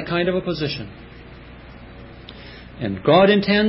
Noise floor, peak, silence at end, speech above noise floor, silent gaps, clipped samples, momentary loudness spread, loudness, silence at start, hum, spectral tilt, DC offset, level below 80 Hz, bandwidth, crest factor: -40 dBFS; -2 dBFS; 0 s; 22 dB; none; under 0.1%; 27 LU; -19 LUFS; 0 s; none; -10 dB/octave; under 0.1%; -46 dBFS; 5.8 kHz; 18 dB